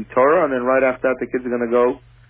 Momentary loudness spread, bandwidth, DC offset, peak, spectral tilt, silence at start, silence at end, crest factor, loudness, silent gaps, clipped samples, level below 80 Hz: 7 LU; 3.6 kHz; under 0.1%; -2 dBFS; -10 dB/octave; 0 s; 0.3 s; 16 dB; -18 LUFS; none; under 0.1%; -52 dBFS